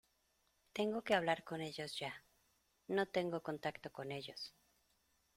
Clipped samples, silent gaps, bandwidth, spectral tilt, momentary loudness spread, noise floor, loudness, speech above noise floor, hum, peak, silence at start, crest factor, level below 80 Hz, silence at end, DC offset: under 0.1%; none; 16 kHz; -5 dB/octave; 13 LU; -79 dBFS; -41 LUFS; 39 dB; none; -20 dBFS; 0.75 s; 22 dB; -78 dBFS; 0.85 s; under 0.1%